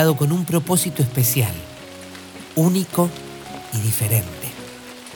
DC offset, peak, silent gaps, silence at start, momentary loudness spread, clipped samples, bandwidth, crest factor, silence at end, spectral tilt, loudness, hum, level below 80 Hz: under 0.1%; -2 dBFS; none; 0 s; 18 LU; under 0.1%; 19 kHz; 18 dB; 0 s; -5 dB/octave; -20 LUFS; none; -52 dBFS